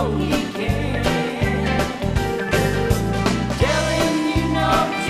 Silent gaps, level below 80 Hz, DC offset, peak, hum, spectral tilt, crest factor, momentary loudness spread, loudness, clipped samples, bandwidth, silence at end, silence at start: none; -30 dBFS; under 0.1%; -4 dBFS; none; -5.5 dB/octave; 16 dB; 4 LU; -20 LUFS; under 0.1%; 15.5 kHz; 0 s; 0 s